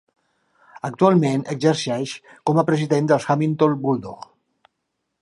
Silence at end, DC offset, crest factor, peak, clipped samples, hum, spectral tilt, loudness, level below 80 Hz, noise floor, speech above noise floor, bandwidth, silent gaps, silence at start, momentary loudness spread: 1.05 s; under 0.1%; 20 dB; -2 dBFS; under 0.1%; none; -6.5 dB/octave; -20 LUFS; -64 dBFS; -77 dBFS; 57 dB; 11.5 kHz; none; 0.85 s; 14 LU